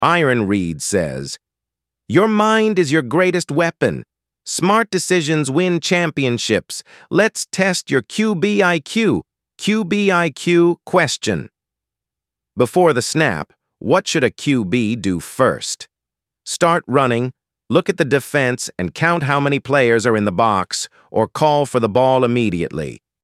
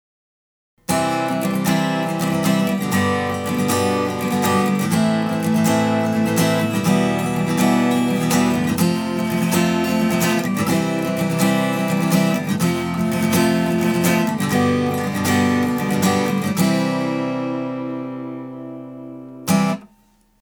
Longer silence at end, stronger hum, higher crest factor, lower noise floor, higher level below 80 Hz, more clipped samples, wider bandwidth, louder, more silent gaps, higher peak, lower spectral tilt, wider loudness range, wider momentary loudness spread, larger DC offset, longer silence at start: second, 0.3 s vs 0.55 s; neither; about the same, 16 dB vs 14 dB; first, -86 dBFS vs -56 dBFS; about the same, -52 dBFS vs -54 dBFS; neither; second, 14.5 kHz vs over 20 kHz; about the same, -17 LUFS vs -19 LUFS; neither; about the same, -2 dBFS vs -4 dBFS; about the same, -5 dB/octave vs -5.5 dB/octave; about the same, 2 LU vs 3 LU; first, 10 LU vs 7 LU; neither; second, 0 s vs 0.9 s